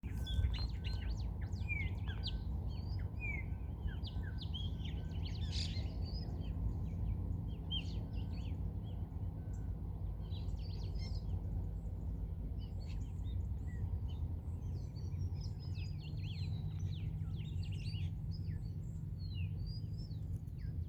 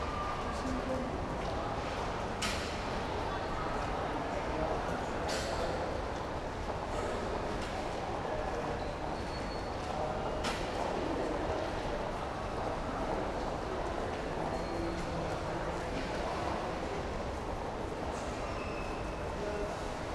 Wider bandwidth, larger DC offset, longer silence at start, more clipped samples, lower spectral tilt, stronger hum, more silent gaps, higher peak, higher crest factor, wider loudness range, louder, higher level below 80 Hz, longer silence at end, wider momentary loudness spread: second, 8.8 kHz vs 12 kHz; neither; about the same, 0.05 s vs 0 s; neither; first, -6.5 dB/octave vs -5 dB/octave; neither; neither; second, -24 dBFS vs -20 dBFS; about the same, 18 dB vs 14 dB; about the same, 2 LU vs 2 LU; second, -43 LUFS vs -37 LUFS; about the same, -44 dBFS vs -44 dBFS; about the same, 0 s vs 0 s; about the same, 4 LU vs 3 LU